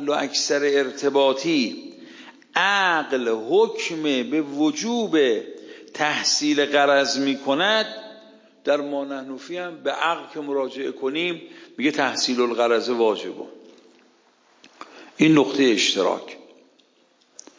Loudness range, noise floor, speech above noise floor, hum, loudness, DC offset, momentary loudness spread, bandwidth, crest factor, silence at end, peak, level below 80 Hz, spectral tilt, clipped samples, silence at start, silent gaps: 5 LU; -61 dBFS; 39 dB; none; -21 LUFS; under 0.1%; 16 LU; 7.6 kHz; 18 dB; 1.2 s; -4 dBFS; -78 dBFS; -3 dB/octave; under 0.1%; 0 s; none